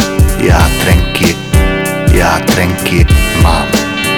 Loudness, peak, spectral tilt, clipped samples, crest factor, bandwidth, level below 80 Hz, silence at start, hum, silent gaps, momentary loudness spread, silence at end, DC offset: -10 LUFS; 0 dBFS; -5 dB/octave; under 0.1%; 10 dB; 19 kHz; -14 dBFS; 0 s; none; none; 3 LU; 0 s; under 0.1%